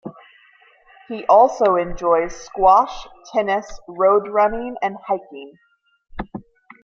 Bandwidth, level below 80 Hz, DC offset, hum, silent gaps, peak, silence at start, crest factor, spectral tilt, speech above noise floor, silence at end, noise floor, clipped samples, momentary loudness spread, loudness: 7.4 kHz; -44 dBFS; under 0.1%; none; none; -2 dBFS; 0.05 s; 18 dB; -5 dB/octave; 35 dB; 0.45 s; -53 dBFS; under 0.1%; 22 LU; -18 LUFS